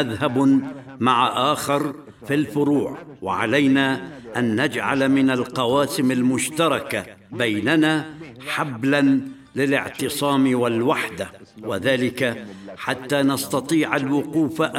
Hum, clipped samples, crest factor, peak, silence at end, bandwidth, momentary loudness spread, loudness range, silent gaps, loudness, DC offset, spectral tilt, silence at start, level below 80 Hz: none; under 0.1%; 18 dB; -2 dBFS; 0 s; 16 kHz; 12 LU; 2 LU; none; -21 LUFS; under 0.1%; -5 dB/octave; 0 s; -60 dBFS